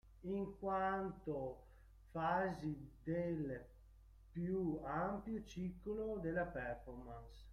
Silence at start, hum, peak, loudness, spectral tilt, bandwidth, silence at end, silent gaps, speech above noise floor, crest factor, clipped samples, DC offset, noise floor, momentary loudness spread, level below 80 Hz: 0.05 s; none; -28 dBFS; -44 LUFS; -8 dB/octave; 12 kHz; 0 s; none; 20 dB; 16 dB; under 0.1%; under 0.1%; -63 dBFS; 13 LU; -60 dBFS